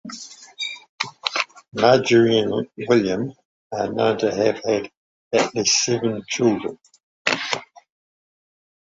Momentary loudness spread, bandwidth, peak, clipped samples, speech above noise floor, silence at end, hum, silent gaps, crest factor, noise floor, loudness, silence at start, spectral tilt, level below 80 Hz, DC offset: 13 LU; 8 kHz; -2 dBFS; under 0.1%; 20 dB; 1.35 s; none; 0.89-0.98 s, 3.45-3.70 s, 4.97-5.31 s, 7.03-7.25 s; 20 dB; -39 dBFS; -21 LUFS; 0.05 s; -3.5 dB/octave; -60 dBFS; under 0.1%